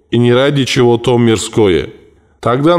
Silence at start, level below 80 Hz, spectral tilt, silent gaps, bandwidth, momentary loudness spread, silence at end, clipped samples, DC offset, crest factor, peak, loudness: 0.1 s; -40 dBFS; -6 dB/octave; none; 13 kHz; 6 LU; 0 s; under 0.1%; under 0.1%; 10 dB; -2 dBFS; -12 LUFS